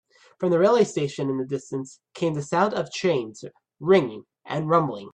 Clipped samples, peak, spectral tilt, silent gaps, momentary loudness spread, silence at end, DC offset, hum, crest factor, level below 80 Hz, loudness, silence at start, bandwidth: under 0.1%; -6 dBFS; -6 dB/octave; none; 15 LU; 0.05 s; under 0.1%; none; 18 dB; -66 dBFS; -24 LUFS; 0.4 s; 9.6 kHz